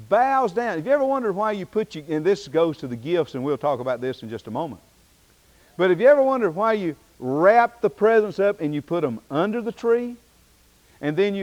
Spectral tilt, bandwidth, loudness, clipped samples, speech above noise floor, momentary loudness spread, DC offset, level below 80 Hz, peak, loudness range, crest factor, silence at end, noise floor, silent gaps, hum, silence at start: -7 dB/octave; 16 kHz; -22 LUFS; under 0.1%; 35 dB; 13 LU; under 0.1%; -62 dBFS; -6 dBFS; 6 LU; 16 dB; 0 s; -57 dBFS; none; none; 0 s